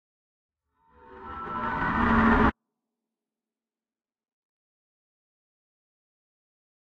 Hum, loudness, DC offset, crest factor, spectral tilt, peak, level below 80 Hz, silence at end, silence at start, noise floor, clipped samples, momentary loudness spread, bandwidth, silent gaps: none; -24 LUFS; under 0.1%; 24 dB; -8 dB/octave; -8 dBFS; -42 dBFS; 4.5 s; 1.1 s; under -90 dBFS; under 0.1%; 19 LU; 6.4 kHz; none